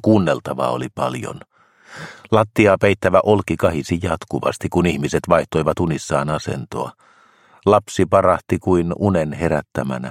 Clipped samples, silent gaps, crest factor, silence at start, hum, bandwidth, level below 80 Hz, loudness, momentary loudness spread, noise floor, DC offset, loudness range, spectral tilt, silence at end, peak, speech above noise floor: under 0.1%; none; 18 dB; 0.05 s; none; 16 kHz; -44 dBFS; -19 LUFS; 11 LU; -52 dBFS; under 0.1%; 3 LU; -6.5 dB/octave; 0 s; 0 dBFS; 34 dB